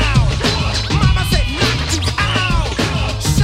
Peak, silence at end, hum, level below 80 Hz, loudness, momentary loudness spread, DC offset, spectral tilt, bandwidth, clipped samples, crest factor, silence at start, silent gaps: -2 dBFS; 0 s; none; -20 dBFS; -16 LUFS; 3 LU; 0.2%; -4.5 dB/octave; 16 kHz; under 0.1%; 14 dB; 0 s; none